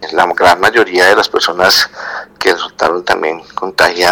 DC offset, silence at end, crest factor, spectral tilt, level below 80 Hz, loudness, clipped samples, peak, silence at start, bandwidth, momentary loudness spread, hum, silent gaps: under 0.1%; 0 s; 12 dB; -2 dB/octave; -46 dBFS; -11 LUFS; 0.2%; 0 dBFS; 0 s; over 20 kHz; 10 LU; none; none